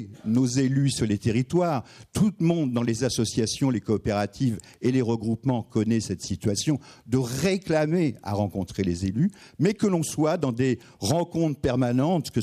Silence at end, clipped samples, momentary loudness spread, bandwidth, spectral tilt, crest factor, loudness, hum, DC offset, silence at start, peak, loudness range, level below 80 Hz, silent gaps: 0 s; under 0.1%; 5 LU; 15 kHz; -6 dB/octave; 14 dB; -25 LUFS; none; under 0.1%; 0 s; -10 dBFS; 2 LU; -52 dBFS; none